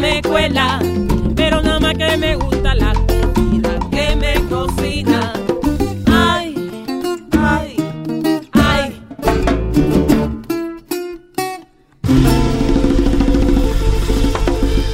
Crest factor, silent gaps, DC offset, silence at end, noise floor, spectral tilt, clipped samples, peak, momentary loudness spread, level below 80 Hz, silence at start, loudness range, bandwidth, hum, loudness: 14 dB; none; under 0.1%; 0 s; -38 dBFS; -6 dB/octave; under 0.1%; 0 dBFS; 9 LU; -20 dBFS; 0 s; 2 LU; 16.5 kHz; none; -16 LUFS